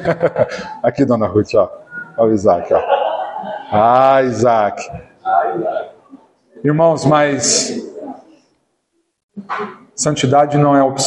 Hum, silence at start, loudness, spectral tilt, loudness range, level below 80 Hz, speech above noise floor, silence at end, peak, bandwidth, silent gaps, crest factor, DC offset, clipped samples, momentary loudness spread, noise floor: none; 0 s; -15 LUFS; -4.5 dB/octave; 4 LU; -52 dBFS; 53 dB; 0 s; 0 dBFS; 11.5 kHz; 9.23-9.29 s; 14 dB; under 0.1%; under 0.1%; 15 LU; -67 dBFS